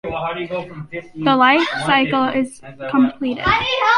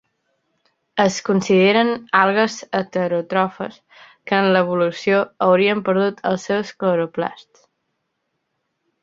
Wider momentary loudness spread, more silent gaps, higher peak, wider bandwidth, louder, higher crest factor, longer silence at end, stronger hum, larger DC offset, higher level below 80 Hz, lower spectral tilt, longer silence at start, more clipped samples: first, 15 LU vs 9 LU; neither; about the same, -2 dBFS vs 0 dBFS; first, 11.5 kHz vs 7.8 kHz; about the same, -17 LUFS vs -18 LUFS; about the same, 16 dB vs 20 dB; second, 0 s vs 1.65 s; neither; neither; first, -46 dBFS vs -64 dBFS; about the same, -5 dB/octave vs -5.5 dB/octave; second, 0.05 s vs 0.95 s; neither